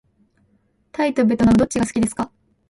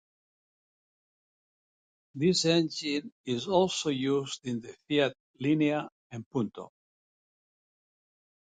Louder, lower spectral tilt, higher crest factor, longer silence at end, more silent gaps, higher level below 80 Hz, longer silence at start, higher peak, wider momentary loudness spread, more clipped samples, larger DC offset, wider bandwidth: first, -19 LUFS vs -29 LUFS; about the same, -6 dB/octave vs -5 dB/octave; second, 14 dB vs 22 dB; second, 0.4 s vs 1.9 s; second, none vs 3.12-3.24 s, 5.20-5.34 s, 5.92-6.10 s, 6.26-6.31 s; first, -42 dBFS vs -70 dBFS; second, 1 s vs 2.15 s; first, -6 dBFS vs -10 dBFS; about the same, 14 LU vs 13 LU; neither; neither; first, 11.5 kHz vs 9.4 kHz